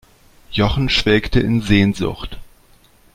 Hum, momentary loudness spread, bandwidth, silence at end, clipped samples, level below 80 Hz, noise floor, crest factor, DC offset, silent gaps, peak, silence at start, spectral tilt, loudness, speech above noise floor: none; 11 LU; 15.5 kHz; 0.7 s; under 0.1%; -30 dBFS; -51 dBFS; 18 dB; under 0.1%; none; 0 dBFS; 0.5 s; -6 dB/octave; -17 LUFS; 35 dB